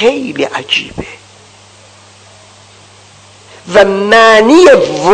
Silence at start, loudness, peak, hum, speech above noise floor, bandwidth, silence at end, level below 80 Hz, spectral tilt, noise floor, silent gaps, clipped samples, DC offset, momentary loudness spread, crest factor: 0 s; -7 LUFS; 0 dBFS; none; 32 dB; 11 kHz; 0 s; -44 dBFS; -4 dB/octave; -39 dBFS; none; 4%; under 0.1%; 17 LU; 10 dB